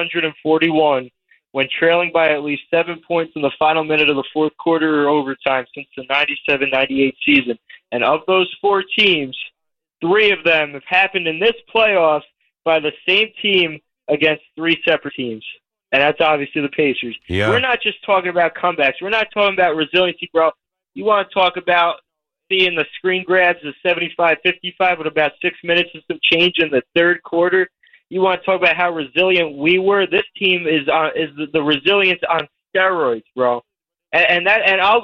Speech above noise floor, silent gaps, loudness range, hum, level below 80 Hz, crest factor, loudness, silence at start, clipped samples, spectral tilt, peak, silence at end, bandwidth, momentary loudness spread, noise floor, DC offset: 61 dB; none; 2 LU; none; -56 dBFS; 14 dB; -16 LUFS; 0 s; under 0.1%; -6 dB/octave; -2 dBFS; 0 s; 6.8 kHz; 8 LU; -78 dBFS; under 0.1%